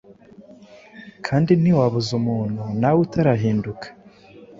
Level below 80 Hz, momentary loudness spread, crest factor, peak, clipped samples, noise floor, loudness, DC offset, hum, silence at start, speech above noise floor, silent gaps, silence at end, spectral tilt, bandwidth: -52 dBFS; 15 LU; 18 dB; -4 dBFS; under 0.1%; -46 dBFS; -20 LUFS; under 0.1%; none; 0.4 s; 27 dB; none; 0.15 s; -8 dB/octave; 7.6 kHz